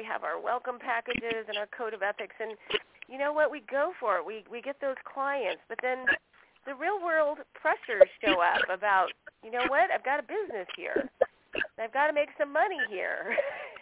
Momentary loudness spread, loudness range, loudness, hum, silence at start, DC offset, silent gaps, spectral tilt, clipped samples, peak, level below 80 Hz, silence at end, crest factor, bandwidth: 11 LU; 5 LU; -30 LUFS; none; 0 s; under 0.1%; none; 0 dB/octave; under 0.1%; -6 dBFS; -68 dBFS; 0 s; 24 dB; 4 kHz